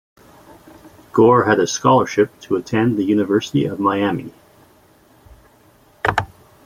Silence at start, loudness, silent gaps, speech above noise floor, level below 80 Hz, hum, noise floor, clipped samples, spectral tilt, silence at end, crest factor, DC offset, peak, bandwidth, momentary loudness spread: 0.85 s; -17 LUFS; none; 36 dB; -52 dBFS; none; -52 dBFS; under 0.1%; -5.5 dB/octave; 0.4 s; 18 dB; under 0.1%; -2 dBFS; 16 kHz; 11 LU